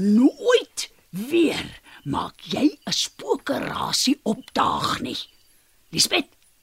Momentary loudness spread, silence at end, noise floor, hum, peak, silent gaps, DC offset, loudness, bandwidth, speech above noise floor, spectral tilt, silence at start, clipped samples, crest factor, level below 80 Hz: 13 LU; 0.4 s; -58 dBFS; none; -4 dBFS; none; under 0.1%; -23 LUFS; 16 kHz; 36 dB; -3.5 dB/octave; 0 s; under 0.1%; 20 dB; -56 dBFS